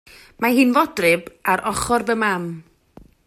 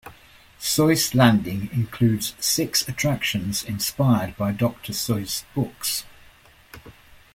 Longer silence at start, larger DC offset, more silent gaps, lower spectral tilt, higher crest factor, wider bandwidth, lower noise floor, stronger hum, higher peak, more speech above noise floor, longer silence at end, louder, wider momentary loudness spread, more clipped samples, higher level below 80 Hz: first, 0.4 s vs 0.05 s; neither; neither; about the same, -4.5 dB/octave vs -4.5 dB/octave; about the same, 18 dB vs 20 dB; about the same, 15 kHz vs 16.5 kHz; about the same, -49 dBFS vs -52 dBFS; neither; about the same, -4 dBFS vs -2 dBFS; about the same, 30 dB vs 29 dB; first, 0.65 s vs 0.45 s; first, -19 LUFS vs -22 LUFS; about the same, 9 LU vs 9 LU; neither; about the same, -48 dBFS vs -50 dBFS